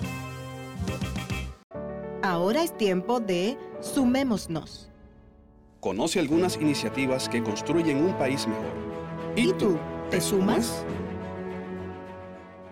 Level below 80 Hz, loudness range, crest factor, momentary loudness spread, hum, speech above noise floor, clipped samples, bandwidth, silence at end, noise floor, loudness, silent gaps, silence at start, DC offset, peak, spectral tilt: -50 dBFS; 3 LU; 12 dB; 14 LU; none; 29 dB; under 0.1%; 17 kHz; 0 s; -54 dBFS; -28 LUFS; 1.64-1.70 s; 0 s; under 0.1%; -16 dBFS; -5 dB/octave